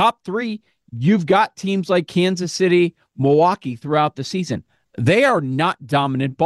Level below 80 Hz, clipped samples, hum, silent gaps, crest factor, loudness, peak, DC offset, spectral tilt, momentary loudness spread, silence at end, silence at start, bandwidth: -60 dBFS; under 0.1%; none; none; 14 dB; -19 LUFS; -4 dBFS; under 0.1%; -6 dB/octave; 11 LU; 0 s; 0 s; 12.5 kHz